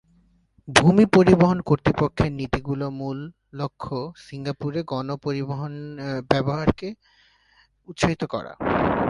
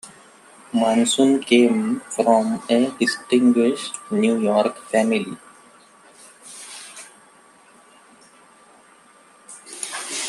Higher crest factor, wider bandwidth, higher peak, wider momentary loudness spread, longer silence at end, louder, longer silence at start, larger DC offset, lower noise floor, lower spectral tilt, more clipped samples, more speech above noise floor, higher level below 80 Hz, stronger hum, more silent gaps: about the same, 22 dB vs 20 dB; about the same, 11.5 kHz vs 12.5 kHz; about the same, 0 dBFS vs -2 dBFS; second, 17 LU vs 22 LU; about the same, 0 s vs 0 s; second, -23 LUFS vs -19 LUFS; first, 0.65 s vs 0.05 s; neither; first, -61 dBFS vs -51 dBFS; first, -6 dB/octave vs -4 dB/octave; neither; first, 38 dB vs 33 dB; first, -44 dBFS vs -70 dBFS; neither; neither